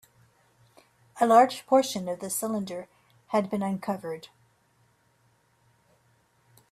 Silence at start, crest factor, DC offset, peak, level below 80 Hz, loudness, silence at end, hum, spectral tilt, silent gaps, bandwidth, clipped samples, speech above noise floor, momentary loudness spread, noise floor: 1.15 s; 22 dB; under 0.1%; -8 dBFS; -74 dBFS; -26 LUFS; 2.45 s; none; -4.5 dB/octave; none; 15.5 kHz; under 0.1%; 41 dB; 17 LU; -67 dBFS